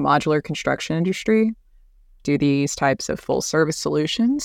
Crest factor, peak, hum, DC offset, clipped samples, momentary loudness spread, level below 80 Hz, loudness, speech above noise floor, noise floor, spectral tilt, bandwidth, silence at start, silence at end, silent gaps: 16 dB; -6 dBFS; none; under 0.1%; under 0.1%; 5 LU; -50 dBFS; -21 LUFS; 32 dB; -52 dBFS; -5 dB/octave; 16 kHz; 0 s; 0 s; none